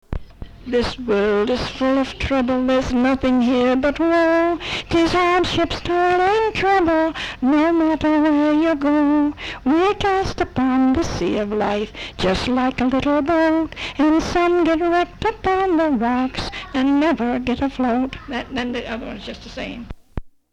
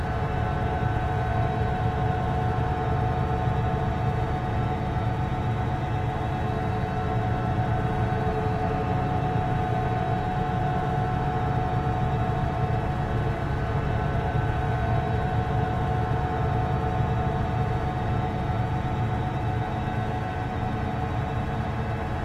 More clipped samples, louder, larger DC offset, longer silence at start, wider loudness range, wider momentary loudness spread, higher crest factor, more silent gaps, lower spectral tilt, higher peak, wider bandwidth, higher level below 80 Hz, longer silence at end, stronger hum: neither; first, -19 LUFS vs -27 LUFS; neither; about the same, 0.1 s vs 0 s; about the same, 3 LU vs 1 LU; first, 10 LU vs 2 LU; about the same, 12 dB vs 14 dB; neither; second, -5.5 dB/octave vs -8 dB/octave; first, -8 dBFS vs -12 dBFS; first, 10 kHz vs 8.8 kHz; about the same, -38 dBFS vs -34 dBFS; first, 0.25 s vs 0 s; neither